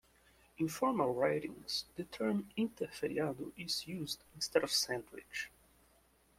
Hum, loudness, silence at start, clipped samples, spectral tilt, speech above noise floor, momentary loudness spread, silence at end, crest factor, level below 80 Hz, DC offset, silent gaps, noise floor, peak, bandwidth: none; -37 LUFS; 0.6 s; under 0.1%; -3.5 dB/octave; 32 dB; 10 LU; 0.9 s; 24 dB; -70 dBFS; under 0.1%; none; -70 dBFS; -16 dBFS; 16.5 kHz